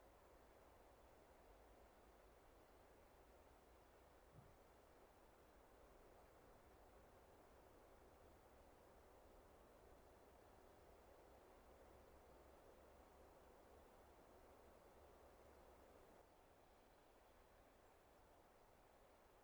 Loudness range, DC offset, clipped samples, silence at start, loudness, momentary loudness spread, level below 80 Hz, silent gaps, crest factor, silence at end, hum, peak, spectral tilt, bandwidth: 1 LU; under 0.1%; under 0.1%; 0 s; -69 LUFS; 1 LU; -76 dBFS; none; 14 dB; 0 s; none; -54 dBFS; -5 dB/octave; over 20 kHz